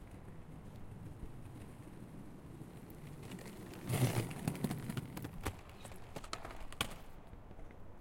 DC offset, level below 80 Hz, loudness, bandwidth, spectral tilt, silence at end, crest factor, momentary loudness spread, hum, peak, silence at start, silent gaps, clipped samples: under 0.1%; -56 dBFS; -45 LUFS; 16.5 kHz; -5 dB/octave; 0 s; 24 dB; 16 LU; none; -20 dBFS; 0 s; none; under 0.1%